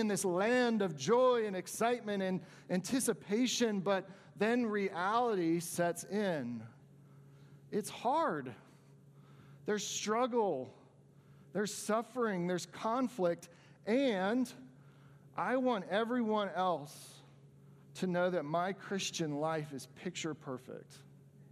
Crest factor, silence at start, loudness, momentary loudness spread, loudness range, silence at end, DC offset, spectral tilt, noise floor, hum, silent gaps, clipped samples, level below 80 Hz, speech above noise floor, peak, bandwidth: 18 dB; 0 s; -35 LUFS; 13 LU; 5 LU; 0.1 s; under 0.1%; -4.5 dB/octave; -62 dBFS; none; none; under 0.1%; -84 dBFS; 27 dB; -18 dBFS; 15.5 kHz